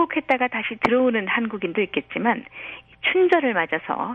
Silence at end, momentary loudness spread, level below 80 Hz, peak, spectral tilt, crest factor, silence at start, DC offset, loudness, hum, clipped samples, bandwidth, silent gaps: 0 s; 8 LU; -60 dBFS; -6 dBFS; -6.5 dB/octave; 18 dB; 0 s; under 0.1%; -22 LUFS; none; under 0.1%; 7.6 kHz; none